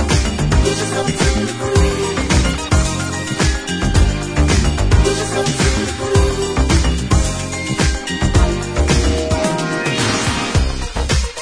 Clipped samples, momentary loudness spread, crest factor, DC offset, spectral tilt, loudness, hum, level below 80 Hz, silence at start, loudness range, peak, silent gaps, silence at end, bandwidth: under 0.1%; 4 LU; 16 dB; under 0.1%; -4.5 dB/octave; -17 LUFS; none; -20 dBFS; 0 s; 1 LU; 0 dBFS; none; 0 s; 11 kHz